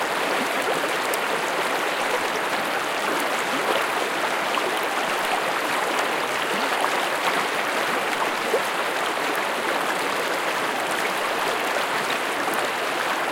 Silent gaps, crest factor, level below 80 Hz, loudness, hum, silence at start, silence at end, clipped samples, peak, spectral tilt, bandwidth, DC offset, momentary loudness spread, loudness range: none; 20 dB; -68 dBFS; -23 LUFS; none; 0 s; 0 s; under 0.1%; -4 dBFS; -1.5 dB/octave; 17 kHz; under 0.1%; 2 LU; 1 LU